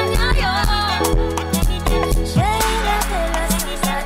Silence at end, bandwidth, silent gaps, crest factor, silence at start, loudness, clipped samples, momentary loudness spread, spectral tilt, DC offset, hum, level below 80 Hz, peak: 0 s; 16.5 kHz; none; 12 dB; 0 s; -19 LUFS; under 0.1%; 3 LU; -4 dB/octave; under 0.1%; none; -22 dBFS; -4 dBFS